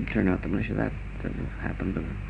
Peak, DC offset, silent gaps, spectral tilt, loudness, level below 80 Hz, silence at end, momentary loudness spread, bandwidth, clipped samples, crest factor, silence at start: -10 dBFS; under 0.1%; none; -9 dB/octave; -30 LUFS; -36 dBFS; 0 s; 8 LU; 8.8 kHz; under 0.1%; 18 dB; 0 s